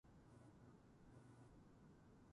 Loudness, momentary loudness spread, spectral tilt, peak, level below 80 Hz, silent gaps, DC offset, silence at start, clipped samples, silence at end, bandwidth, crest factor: -68 LUFS; 2 LU; -7 dB/octave; -54 dBFS; -76 dBFS; none; under 0.1%; 0.05 s; under 0.1%; 0 s; 11 kHz; 12 dB